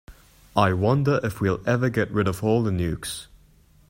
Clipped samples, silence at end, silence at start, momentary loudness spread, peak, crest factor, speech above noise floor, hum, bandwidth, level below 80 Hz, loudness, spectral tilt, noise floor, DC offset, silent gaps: under 0.1%; 0.65 s; 0.1 s; 7 LU; -4 dBFS; 20 dB; 33 dB; none; 16 kHz; -48 dBFS; -23 LUFS; -6.5 dB/octave; -55 dBFS; under 0.1%; none